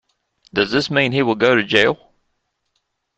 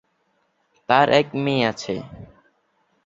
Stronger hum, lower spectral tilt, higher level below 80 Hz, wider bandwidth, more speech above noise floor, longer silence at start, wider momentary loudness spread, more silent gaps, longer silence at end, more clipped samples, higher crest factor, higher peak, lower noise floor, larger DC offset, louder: neither; about the same, -5.5 dB/octave vs -5.5 dB/octave; about the same, -56 dBFS vs -58 dBFS; first, 9 kHz vs 7.8 kHz; first, 55 dB vs 48 dB; second, 0.55 s vs 0.9 s; second, 8 LU vs 20 LU; neither; first, 1.2 s vs 0.8 s; neither; about the same, 18 dB vs 22 dB; about the same, 0 dBFS vs -2 dBFS; first, -72 dBFS vs -68 dBFS; neither; first, -17 LUFS vs -20 LUFS